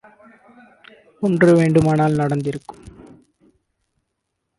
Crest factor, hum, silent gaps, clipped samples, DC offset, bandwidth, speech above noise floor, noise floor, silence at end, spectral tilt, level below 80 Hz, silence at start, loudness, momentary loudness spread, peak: 18 dB; none; none; under 0.1%; under 0.1%; 11.5 kHz; 60 dB; -76 dBFS; 1.85 s; -8 dB/octave; -52 dBFS; 1.2 s; -17 LUFS; 16 LU; -4 dBFS